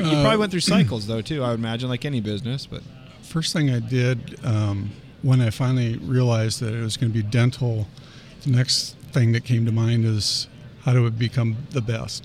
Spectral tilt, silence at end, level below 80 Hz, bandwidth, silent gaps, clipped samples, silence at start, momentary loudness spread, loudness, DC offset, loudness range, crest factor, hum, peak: -5.5 dB/octave; 0 s; -50 dBFS; 13.5 kHz; none; under 0.1%; 0 s; 9 LU; -22 LUFS; under 0.1%; 3 LU; 16 dB; none; -6 dBFS